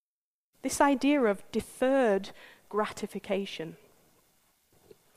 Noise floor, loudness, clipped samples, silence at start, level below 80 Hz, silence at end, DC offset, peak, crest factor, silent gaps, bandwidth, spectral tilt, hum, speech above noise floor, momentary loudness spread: under -90 dBFS; -29 LUFS; under 0.1%; 0.65 s; -64 dBFS; 1.4 s; under 0.1%; -10 dBFS; 22 dB; none; 15.5 kHz; -4.5 dB/octave; none; over 61 dB; 14 LU